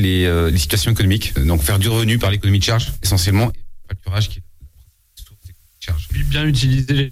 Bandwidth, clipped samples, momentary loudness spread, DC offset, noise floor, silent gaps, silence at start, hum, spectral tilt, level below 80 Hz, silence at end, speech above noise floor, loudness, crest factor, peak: 16 kHz; under 0.1%; 9 LU; under 0.1%; -50 dBFS; none; 0 s; none; -5 dB/octave; -26 dBFS; 0 s; 35 dB; -17 LUFS; 10 dB; -6 dBFS